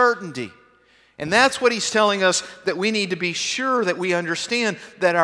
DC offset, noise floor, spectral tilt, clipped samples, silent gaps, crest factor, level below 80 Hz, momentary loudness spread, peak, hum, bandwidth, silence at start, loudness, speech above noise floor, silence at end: under 0.1%; -57 dBFS; -3 dB/octave; under 0.1%; none; 20 dB; -64 dBFS; 10 LU; -2 dBFS; none; 11 kHz; 0 s; -20 LUFS; 35 dB; 0 s